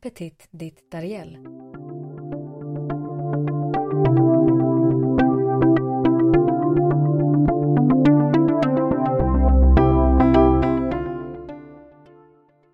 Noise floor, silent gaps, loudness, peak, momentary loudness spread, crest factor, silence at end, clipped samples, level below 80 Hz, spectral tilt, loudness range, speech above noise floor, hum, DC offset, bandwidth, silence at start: -55 dBFS; none; -18 LUFS; 0 dBFS; 20 LU; 18 dB; 1 s; under 0.1%; -26 dBFS; -10.5 dB/octave; 11 LU; 21 dB; none; under 0.1%; 5.2 kHz; 0.05 s